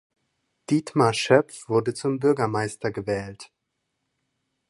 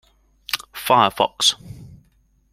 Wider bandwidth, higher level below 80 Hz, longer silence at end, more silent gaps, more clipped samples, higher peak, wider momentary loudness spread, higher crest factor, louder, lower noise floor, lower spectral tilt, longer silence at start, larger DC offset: second, 11.5 kHz vs 16.5 kHz; about the same, -60 dBFS vs -56 dBFS; first, 1.25 s vs 0.65 s; neither; neither; about the same, -2 dBFS vs -2 dBFS; second, 9 LU vs 21 LU; about the same, 24 dB vs 22 dB; second, -24 LUFS vs -19 LUFS; first, -78 dBFS vs -60 dBFS; first, -5.5 dB/octave vs -2 dB/octave; first, 0.7 s vs 0.5 s; neither